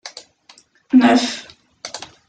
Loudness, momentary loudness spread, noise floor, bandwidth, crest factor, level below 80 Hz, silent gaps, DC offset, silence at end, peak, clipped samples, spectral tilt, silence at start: -15 LUFS; 22 LU; -51 dBFS; 9.2 kHz; 18 dB; -64 dBFS; none; under 0.1%; 0.25 s; -2 dBFS; under 0.1%; -3.5 dB/octave; 0.05 s